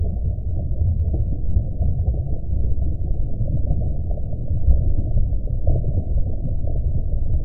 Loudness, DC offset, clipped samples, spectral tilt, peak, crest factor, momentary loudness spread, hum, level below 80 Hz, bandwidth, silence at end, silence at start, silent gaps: -24 LUFS; under 0.1%; under 0.1%; -15 dB/octave; -2 dBFS; 16 dB; 5 LU; none; -22 dBFS; 0.8 kHz; 0 s; 0 s; none